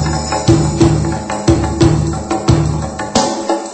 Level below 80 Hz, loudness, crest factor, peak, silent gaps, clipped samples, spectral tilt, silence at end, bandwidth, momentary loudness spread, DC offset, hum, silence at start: -26 dBFS; -14 LUFS; 14 dB; 0 dBFS; none; 0.1%; -6 dB/octave; 0 s; 8.8 kHz; 6 LU; under 0.1%; none; 0 s